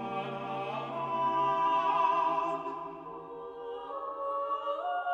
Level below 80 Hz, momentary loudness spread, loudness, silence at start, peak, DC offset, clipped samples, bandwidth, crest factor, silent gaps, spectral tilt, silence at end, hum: -74 dBFS; 15 LU; -32 LUFS; 0 s; -16 dBFS; under 0.1%; under 0.1%; 7.4 kHz; 16 dB; none; -6 dB/octave; 0 s; none